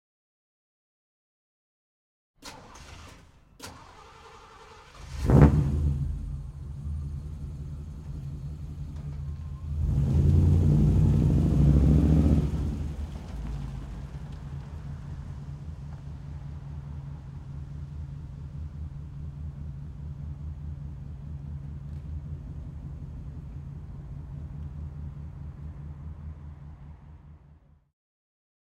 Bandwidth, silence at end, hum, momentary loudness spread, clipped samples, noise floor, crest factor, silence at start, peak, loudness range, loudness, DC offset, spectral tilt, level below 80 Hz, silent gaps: 9.8 kHz; 1.25 s; none; 24 LU; under 0.1%; -56 dBFS; 26 dB; 2.4 s; -4 dBFS; 19 LU; -29 LUFS; under 0.1%; -9 dB/octave; -36 dBFS; none